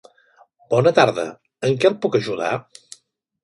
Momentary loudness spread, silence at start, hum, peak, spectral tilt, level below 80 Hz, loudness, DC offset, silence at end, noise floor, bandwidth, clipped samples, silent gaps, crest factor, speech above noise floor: 12 LU; 0.7 s; none; 0 dBFS; -5.5 dB/octave; -64 dBFS; -20 LUFS; under 0.1%; 0.85 s; -58 dBFS; 11.5 kHz; under 0.1%; none; 20 dB; 40 dB